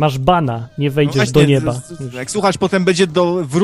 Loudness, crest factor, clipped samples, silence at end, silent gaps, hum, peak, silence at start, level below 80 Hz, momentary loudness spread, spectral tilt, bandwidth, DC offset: -15 LUFS; 14 dB; under 0.1%; 0 s; none; none; 0 dBFS; 0 s; -40 dBFS; 10 LU; -6 dB/octave; 15 kHz; under 0.1%